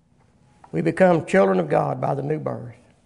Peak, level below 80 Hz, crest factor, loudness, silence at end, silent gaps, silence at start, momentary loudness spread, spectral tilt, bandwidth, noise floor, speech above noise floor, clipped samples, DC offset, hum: -4 dBFS; -60 dBFS; 18 dB; -21 LUFS; 0.35 s; none; 0.75 s; 13 LU; -7.5 dB/octave; 10.5 kHz; -58 dBFS; 38 dB; under 0.1%; under 0.1%; none